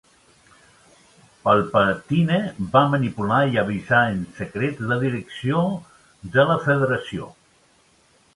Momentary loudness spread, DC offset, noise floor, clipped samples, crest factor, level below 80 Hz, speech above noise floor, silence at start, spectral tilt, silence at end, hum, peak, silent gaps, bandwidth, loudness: 11 LU; under 0.1%; -58 dBFS; under 0.1%; 20 dB; -54 dBFS; 38 dB; 1.45 s; -7.5 dB/octave; 1.05 s; none; -2 dBFS; none; 11.5 kHz; -21 LUFS